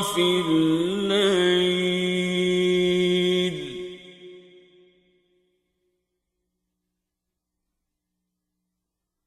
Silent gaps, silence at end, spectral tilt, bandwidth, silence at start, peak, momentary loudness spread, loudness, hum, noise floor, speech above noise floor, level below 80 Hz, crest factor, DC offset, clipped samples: none; 4.85 s; -5 dB/octave; 13 kHz; 0 s; -10 dBFS; 13 LU; -22 LUFS; none; -83 dBFS; 62 dB; -62 dBFS; 16 dB; under 0.1%; under 0.1%